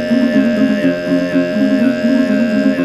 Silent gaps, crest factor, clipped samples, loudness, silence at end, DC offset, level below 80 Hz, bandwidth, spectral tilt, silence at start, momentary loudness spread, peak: none; 12 dB; under 0.1%; -14 LUFS; 0 s; under 0.1%; -50 dBFS; 11.5 kHz; -7 dB/octave; 0 s; 2 LU; -2 dBFS